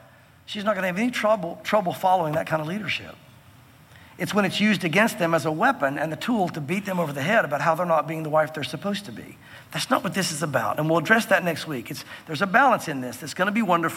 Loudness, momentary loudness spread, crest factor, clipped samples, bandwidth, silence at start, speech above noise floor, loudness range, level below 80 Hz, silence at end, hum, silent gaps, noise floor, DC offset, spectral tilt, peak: -23 LUFS; 12 LU; 20 dB; under 0.1%; 17 kHz; 0.5 s; 27 dB; 3 LU; -66 dBFS; 0 s; none; none; -51 dBFS; under 0.1%; -5 dB/octave; -4 dBFS